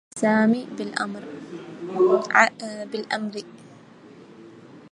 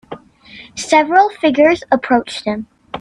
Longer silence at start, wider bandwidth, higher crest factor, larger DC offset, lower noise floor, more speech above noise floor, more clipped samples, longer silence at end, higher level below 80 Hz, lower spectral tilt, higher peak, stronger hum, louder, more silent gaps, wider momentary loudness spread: about the same, 0.15 s vs 0.1 s; about the same, 11 kHz vs 11.5 kHz; first, 24 dB vs 16 dB; neither; first, -47 dBFS vs -40 dBFS; about the same, 25 dB vs 26 dB; neither; about the same, 0.05 s vs 0 s; second, -74 dBFS vs -52 dBFS; about the same, -5 dB/octave vs -4 dB/octave; about the same, 0 dBFS vs 0 dBFS; neither; second, -23 LUFS vs -14 LUFS; neither; about the same, 19 LU vs 19 LU